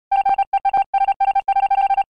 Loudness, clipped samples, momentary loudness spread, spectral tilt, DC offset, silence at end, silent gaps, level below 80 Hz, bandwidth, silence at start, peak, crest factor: -18 LUFS; under 0.1%; 2 LU; -3 dB/octave; 0.4%; 0.05 s; 0.47-0.52 s, 0.86-0.93 s, 1.16-1.20 s; -52 dBFS; 5 kHz; 0.1 s; -10 dBFS; 8 dB